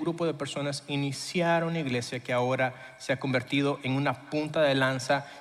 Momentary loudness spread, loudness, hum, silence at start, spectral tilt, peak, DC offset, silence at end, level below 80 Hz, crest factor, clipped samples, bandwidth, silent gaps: 6 LU; -29 LUFS; none; 0 s; -5.5 dB/octave; -12 dBFS; under 0.1%; 0 s; -68 dBFS; 16 dB; under 0.1%; 13.5 kHz; none